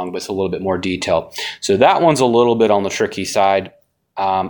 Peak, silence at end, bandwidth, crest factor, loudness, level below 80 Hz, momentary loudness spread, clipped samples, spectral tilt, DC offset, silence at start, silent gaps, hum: 0 dBFS; 0 s; 19 kHz; 16 dB; -16 LUFS; -52 dBFS; 10 LU; under 0.1%; -4.5 dB/octave; under 0.1%; 0 s; none; none